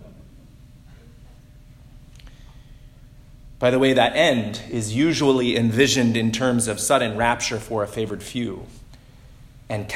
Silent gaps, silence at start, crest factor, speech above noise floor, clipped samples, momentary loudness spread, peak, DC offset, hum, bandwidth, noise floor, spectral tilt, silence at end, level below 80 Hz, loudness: none; 0 s; 20 dB; 26 dB; under 0.1%; 11 LU; -4 dBFS; under 0.1%; none; 16 kHz; -46 dBFS; -4.5 dB/octave; 0 s; -46 dBFS; -21 LUFS